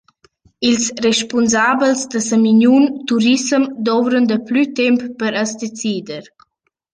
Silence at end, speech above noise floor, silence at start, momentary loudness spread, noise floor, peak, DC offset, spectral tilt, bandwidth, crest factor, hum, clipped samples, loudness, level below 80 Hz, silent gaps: 0.7 s; 55 dB; 0.6 s; 10 LU; -70 dBFS; -2 dBFS; under 0.1%; -3.5 dB/octave; 10 kHz; 14 dB; none; under 0.1%; -15 LUFS; -60 dBFS; none